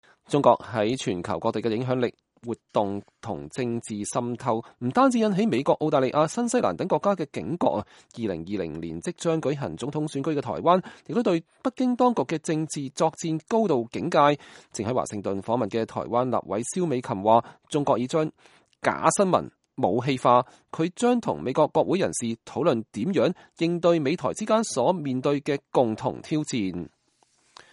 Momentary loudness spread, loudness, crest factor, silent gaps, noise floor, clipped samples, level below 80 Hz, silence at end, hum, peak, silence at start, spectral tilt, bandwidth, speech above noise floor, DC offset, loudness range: 10 LU; -25 LUFS; 22 dB; none; -66 dBFS; under 0.1%; -62 dBFS; 0.85 s; none; -2 dBFS; 0.3 s; -5.5 dB/octave; 11.5 kHz; 42 dB; under 0.1%; 4 LU